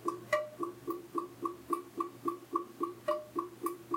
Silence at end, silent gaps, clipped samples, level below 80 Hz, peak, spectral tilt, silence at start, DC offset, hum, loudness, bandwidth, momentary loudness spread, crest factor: 0 s; none; under 0.1%; -78 dBFS; -18 dBFS; -5 dB/octave; 0 s; under 0.1%; none; -38 LUFS; 16.5 kHz; 6 LU; 20 dB